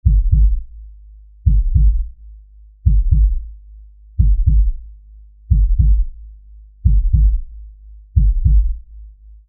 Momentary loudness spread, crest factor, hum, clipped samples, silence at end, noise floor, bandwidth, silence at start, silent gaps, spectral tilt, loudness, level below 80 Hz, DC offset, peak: 14 LU; 14 dB; none; under 0.1%; 0.4 s; -42 dBFS; 0.4 kHz; 0.05 s; none; -22.5 dB/octave; -18 LUFS; -16 dBFS; under 0.1%; -2 dBFS